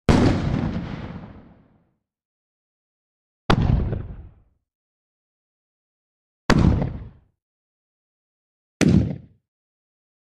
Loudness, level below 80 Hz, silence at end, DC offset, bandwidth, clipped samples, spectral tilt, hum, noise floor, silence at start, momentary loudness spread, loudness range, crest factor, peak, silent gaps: -22 LUFS; -34 dBFS; 1.15 s; under 0.1%; 12 kHz; under 0.1%; -7 dB/octave; none; -66 dBFS; 0.1 s; 21 LU; 4 LU; 22 dB; -4 dBFS; 2.25-3.49 s, 4.75-6.49 s, 7.42-8.80 s